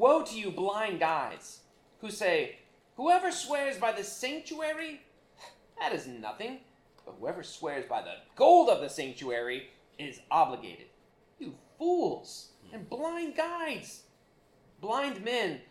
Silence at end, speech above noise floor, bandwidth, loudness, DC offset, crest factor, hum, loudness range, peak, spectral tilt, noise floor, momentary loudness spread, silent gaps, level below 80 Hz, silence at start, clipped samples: 0.1 s; 34 dB; 15 kHz; -31 LUFS; under 0.1%; 22 dB; none; 10 LU; -10 dBFS; -3.5 dB/octave; -65 dBFS; 20 LU; none; -72 dBFS; 0 s; under 0.1%